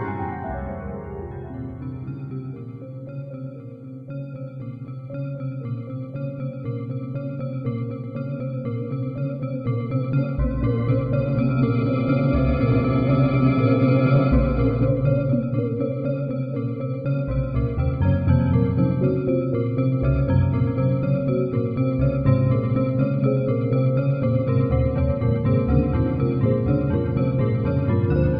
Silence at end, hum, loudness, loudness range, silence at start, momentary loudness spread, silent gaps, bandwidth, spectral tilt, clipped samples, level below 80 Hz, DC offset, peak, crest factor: 0 s; none; -22 LUFS; 13 LU; 0 s; 14 LU; none; 5 kHz; -12 dB/octave; under 0.1%; -34 dBFS; under 0.1%; -6 dBFS; 16 dB